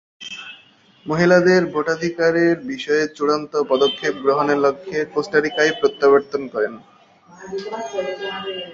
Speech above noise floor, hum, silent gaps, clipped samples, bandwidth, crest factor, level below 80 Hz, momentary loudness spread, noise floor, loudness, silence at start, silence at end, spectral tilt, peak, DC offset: 32 dB; none; none; under 0.1%; 7.6 kHz; 18 dB; -62 dBFS; 14 LU; -51 dBFS; -19 LUFS; 0.2 s; 0 s; -5 dB/octave; -2 dBFS; under 0.1%